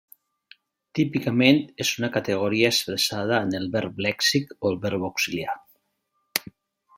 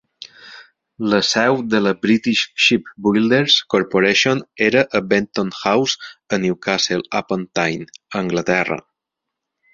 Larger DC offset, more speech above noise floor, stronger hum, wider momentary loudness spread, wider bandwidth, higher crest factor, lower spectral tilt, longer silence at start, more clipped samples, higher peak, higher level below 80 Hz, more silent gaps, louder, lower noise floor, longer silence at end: neither; second, 51 dB vs 64 dB; neither; about the same, 10 LU vs 10 LU; first, 16.5 kHz vs 7.8 kHz; first, 26 dB vs 18 dB; about the same, -4 dB/octave vs -4 dB/octave; first, 0.95 s vs 0.2 s; neither; about the same, 0 dBFS vs -2 dBFS; second, -64 dBFS vs -58 dBFS; neither; second, -24 LUFS vs -17 LUFS; second, -74 dBFS vs -82 dBFS; second, 0.55 s vs 0.95 s